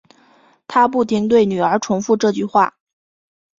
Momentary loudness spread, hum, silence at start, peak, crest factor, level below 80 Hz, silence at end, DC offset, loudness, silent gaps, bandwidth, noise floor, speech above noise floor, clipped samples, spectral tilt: 4 LU; none; 0.7 s; -2 dBFS; 16 dB; -58 dBFS; 0.9 s; under 0.1%; -17 LUFS; none; 7.6 kHz; -53 dBFS; 37 dB; under 0.1%; -5.5 dB/octave